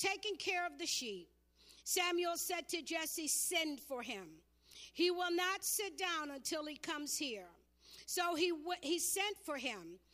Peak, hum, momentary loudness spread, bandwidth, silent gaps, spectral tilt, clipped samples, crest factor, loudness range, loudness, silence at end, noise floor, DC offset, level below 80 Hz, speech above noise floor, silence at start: -22 dBFS; none; 13 LU; 15.5 kHz; none; -0.5 dB/octave; under 0.1%; 20 dB; 2 LU; -38 LUFS; 0.15 s; -66 dBFS; under 0.1%; -76 dBFS; 26 dB; 0 s